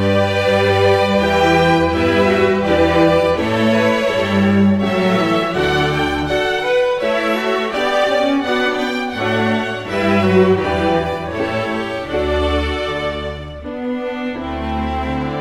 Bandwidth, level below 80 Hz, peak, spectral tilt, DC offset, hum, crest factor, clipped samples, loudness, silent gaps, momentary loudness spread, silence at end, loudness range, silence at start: 15.5 kHz; -34 dBFS; -2 dBFS; -6 dB/octave; under 0.1%; none; 14 dB; under 0.1%; -16 LUFS; none; 9 LU; 0 s; 7 LU; 0 s